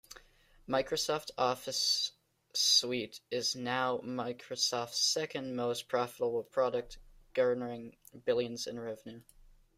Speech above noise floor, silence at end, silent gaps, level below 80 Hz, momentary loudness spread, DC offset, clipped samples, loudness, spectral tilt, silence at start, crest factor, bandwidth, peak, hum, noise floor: 29 dB; 0.55 s; none; -66 dBFS; 11 LU; under 0.1%; under 0.1%; -33 LUFS; -2 dB/octave; 0.1 s; 20 dB; 16 kHz; -14 dBFS; none; -63 dBFS